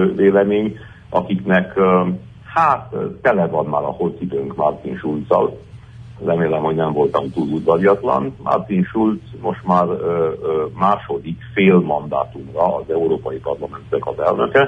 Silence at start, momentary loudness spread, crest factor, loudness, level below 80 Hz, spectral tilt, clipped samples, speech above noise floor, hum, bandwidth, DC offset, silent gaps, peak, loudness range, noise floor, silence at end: 0 s; 10 LU; 16 dB; -18 LUFS; -48 dBFS; -9 dB/octave; under 0.1%; 20 dB; none; 6 kHz; under 0.1%; none; -2 dBFS; 2 LU; -37 dBFS; 0 s